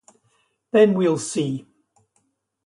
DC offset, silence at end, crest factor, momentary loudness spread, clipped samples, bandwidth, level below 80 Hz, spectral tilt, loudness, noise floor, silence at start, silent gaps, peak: under 0.1%; 1.05 s; 18 dB; 11 LU; under 0.1%; 11.5 kHz; -68 dBFS; -5.5 dB/octave; -20 LUFS; -70 dBFS; 0.75 s; none; -4 dBFS